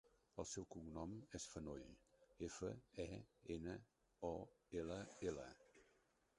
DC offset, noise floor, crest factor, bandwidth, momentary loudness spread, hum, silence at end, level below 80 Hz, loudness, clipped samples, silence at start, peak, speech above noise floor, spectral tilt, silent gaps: under 0.1%; -80 dBFS; 20 dB; 11 kHz; 8 LU; none; 0.55 s; -68 dBFS; -53 LUFS; under 0.1%; 0.05 s; -32 dBFS; 29 dB; -5 dB/octave; none